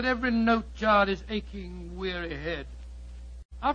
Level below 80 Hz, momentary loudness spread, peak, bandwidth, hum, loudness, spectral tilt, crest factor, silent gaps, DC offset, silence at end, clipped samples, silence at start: -42 dBFS; 22 LU; -10 dBFS; 7.4 kHz; none; -28 LUFS; -6.5 dB/octave; 18 dB; 3.45-3.49 s; under 0.1%; 0 s; under 0.1%; 0 s